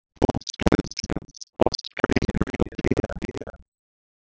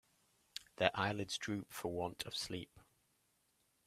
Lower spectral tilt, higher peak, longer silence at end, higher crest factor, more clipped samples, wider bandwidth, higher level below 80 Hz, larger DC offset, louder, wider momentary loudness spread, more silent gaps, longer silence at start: first, -5.5 dB/octave vs -4 dB/octave; first, 0 dBFS vs -14 dBFS; second, 0.65 s vs 1.05 s; about the same, 26 dB vs 30 dB; neither; second, 8 kHz vs 15.5 kHz; first, -36 dBFS vs -72 dBFS; neither; first, -25 LUFS vs -40 LUFS; second, 12 LU vs 16 LU; neither; second, 0.2 s vs 0.6 s